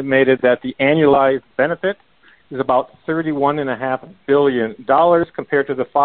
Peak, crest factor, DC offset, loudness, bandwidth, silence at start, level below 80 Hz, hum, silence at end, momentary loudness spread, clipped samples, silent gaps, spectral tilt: -2 dBFS; 14 dB; 0.1%; -17 LUFS; 4.3 kHz; 0 s; -54 dBFS; none; 0 s; 10 LU; under 0.1%; none; -11 dB/octave